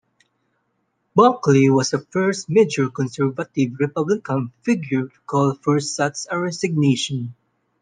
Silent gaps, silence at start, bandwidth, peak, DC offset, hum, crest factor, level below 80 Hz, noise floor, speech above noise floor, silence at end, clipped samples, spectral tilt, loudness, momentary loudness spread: none; 1.15 s; 9.8 kHz; -2 dBFS; under 0.1%; none; 18 dB; -64 dBFS; -71 dBFS; 51 dB; 0.5 s; under 0.1%; -5.5 dB/octave; -20 LUFS; 9 LU